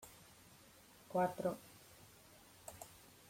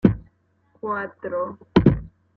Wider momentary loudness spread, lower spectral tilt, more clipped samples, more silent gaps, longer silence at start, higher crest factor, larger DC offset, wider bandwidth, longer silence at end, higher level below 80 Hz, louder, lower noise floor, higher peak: first, 23 LU vs 13 LU; second, -5.5 dB/octave vs -9.5 dB/octave; neither; neither; about the same, 0 s vs 0.05 s; about the same, 22 dB vs 20 dB; neither; first, 16.5 kHz vs 6.2 kHz; about the same, 0.2 s vs 0.3 s; second, -76 dBFS vs -40 dBFS; second, -42 LUFS vs -23 LUFS; about the same, -64 dBFS vs -63 dBFS; second, -26 dBFS vs -2 dBFS